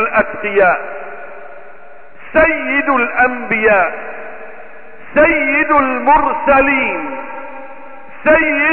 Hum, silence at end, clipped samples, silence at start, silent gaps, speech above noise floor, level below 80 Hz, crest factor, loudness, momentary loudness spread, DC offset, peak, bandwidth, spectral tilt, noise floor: none; 0 s; under 0.1%; 0 s; none; 27 dB; -40 dBFS; 14 dB; -13 LUFS; 20 LU; 3%; -2 dBFS; 4.2 kHz; -10 dB/octave; -40 dBFS